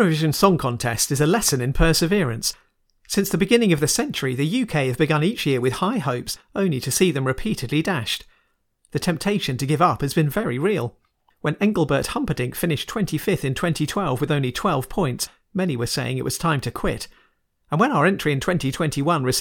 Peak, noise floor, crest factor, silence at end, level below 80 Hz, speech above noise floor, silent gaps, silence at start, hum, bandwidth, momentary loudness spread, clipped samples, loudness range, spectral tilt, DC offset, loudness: 0 dBFS; -66 dBFS; 20 dB; 0 s; -40 dBFS; 45 dB; none; 0 s; none; 19 kHz; 8 LU; under 0.1%; 3 LU; -5 dB/octave; under 0.1%; -22 LUFS